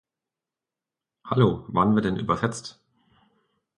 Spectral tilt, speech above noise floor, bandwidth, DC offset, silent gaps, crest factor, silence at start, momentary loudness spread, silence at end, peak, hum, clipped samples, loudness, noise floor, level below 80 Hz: -7 dB/octave; 66 dB; 11 kHz; under 0.1%; none; 22 dB; 1.25 s; 11 LU; 1.05 s; -6 dBFS; none; under 0.1%; -24 LUFS; -89 dBFS; -54 dBFS